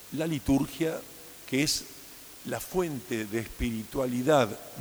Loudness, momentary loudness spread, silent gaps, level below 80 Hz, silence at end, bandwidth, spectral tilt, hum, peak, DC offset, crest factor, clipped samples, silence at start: -30 LUFS; 18 LU; none; -48 dBFS; 0 s; over 20 kHz; -4.5 dB/octave; none; -10 dBFS; under 0.1%; 20 dB; under 0.1%; 0 s